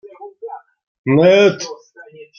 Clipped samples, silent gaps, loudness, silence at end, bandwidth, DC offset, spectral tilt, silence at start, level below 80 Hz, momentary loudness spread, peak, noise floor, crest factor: under 0.1%; 0.87-1.04 s; -12 LUFS; 0.15 s; 7 kHz; under 0.1%; -6 dB/octave; 0.05 s; -62 dBFS; 25 LU; -2 dBFS; -41 dBFS; 16 dB